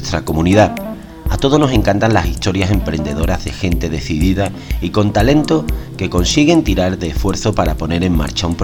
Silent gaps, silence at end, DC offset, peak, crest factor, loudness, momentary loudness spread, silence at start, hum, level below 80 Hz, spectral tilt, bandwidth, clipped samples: none; 0 s; under 0.1%; 0 dBFS; 14 dB; -15 LUFS; 8 LU; 0 s; none; -24 dBFS; -5.5 dB/octave; 17.5 kHz; under 0.1%